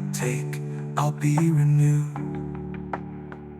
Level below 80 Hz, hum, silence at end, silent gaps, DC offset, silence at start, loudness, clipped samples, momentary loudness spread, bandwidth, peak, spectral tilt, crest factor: -52 dBFS; none; 0 s; none; under 0.1%; 0 s; -25 LUFS; under 0.1%; 14 LU; 14 kHz; -10 dBFS; -7 dB/octave; 14 dB